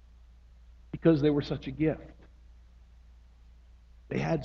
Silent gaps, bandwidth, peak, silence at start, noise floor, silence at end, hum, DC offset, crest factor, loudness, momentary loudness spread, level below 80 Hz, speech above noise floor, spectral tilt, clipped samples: none; 6.8 kHz; -12 dBFS; 0.7 s; -55 dBFS; 0 s; none; under 0.1%; 20 dB; -29 LUFS; 17 LU; -52 dBFS; 27 dB; -8.5 dB/octave; under 0.1%